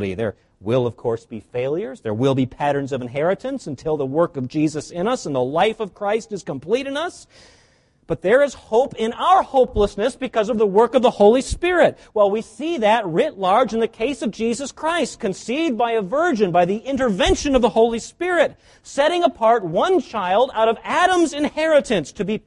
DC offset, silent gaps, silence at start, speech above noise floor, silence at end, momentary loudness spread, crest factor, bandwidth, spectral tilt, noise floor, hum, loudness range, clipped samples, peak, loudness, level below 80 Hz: under 0.1%; none; 0 s; 38 dB; 0.1 s; 9 LU; 18 dB; 11.5 kHz; -5 dB/octave; -57 dBFS; none; 5 LU; under 0.1%; -2 dBFS; -20 LUFS; -42 dBFS